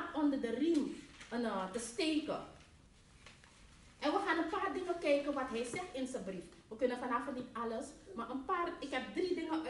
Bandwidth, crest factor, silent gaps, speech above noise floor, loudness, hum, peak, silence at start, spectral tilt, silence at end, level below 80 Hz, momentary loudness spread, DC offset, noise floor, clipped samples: 11.5 kHz; 18 dB; none; 25 dB; -38 LUFS; none; -20 dBFS; 0 s; -4 dB/octave; 0 s; -66 dBFS; 12 LU; under 0.1%; -63 dBFS; under 0.1%